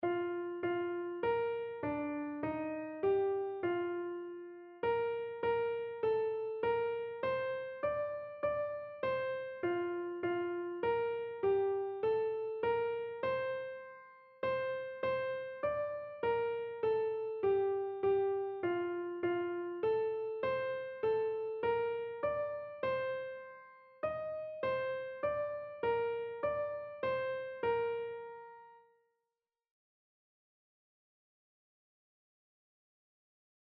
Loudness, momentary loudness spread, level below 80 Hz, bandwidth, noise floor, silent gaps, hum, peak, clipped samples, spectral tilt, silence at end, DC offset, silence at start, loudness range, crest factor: -37 LUFS; 7 LU; -72 dBFS; 5.2 kHz; under -90 dBFS; none; none; -22 dBFS; under 0.1%; -4.5 dB/octave; 5 s; under 0.1%; 0 s; 4 LU; 14 dB